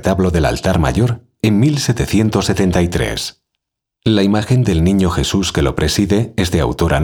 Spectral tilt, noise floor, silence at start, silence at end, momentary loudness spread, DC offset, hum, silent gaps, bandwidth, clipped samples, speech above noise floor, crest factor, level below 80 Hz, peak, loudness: -5.5 dB/octave; -77 dBFS; 0 s; 0 s; 5 LU; under 0.1%; none; none; 18.5 kHz; under 0.1%; 63 dB; 14 dB; -28 dBFS; 0 dBFS; -15 LUFS